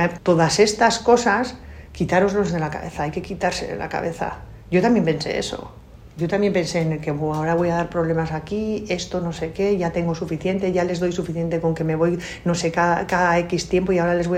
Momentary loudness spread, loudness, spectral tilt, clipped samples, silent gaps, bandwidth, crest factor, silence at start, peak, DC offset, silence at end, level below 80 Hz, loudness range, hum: 10 LU; -21 LUFS; -5.5 dB/octave; under 0.1%; none; 14 kHz; 18 dB; 0 s; -2 dBFS; under 0.1%; 0 s; -44 dBFS; 3 LU; none